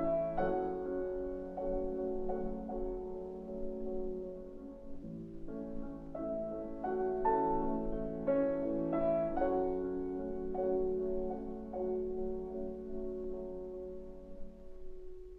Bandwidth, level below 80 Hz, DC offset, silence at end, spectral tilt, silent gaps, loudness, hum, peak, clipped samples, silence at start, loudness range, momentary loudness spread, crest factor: 4 kHz; -48 dBFS; under 0.1%; 0 s; -10 dB/octave; none; -38 LUFS; none; -20 dBFS; under 0.1%; 0 s; 9 LU; 15 LU; 16 dB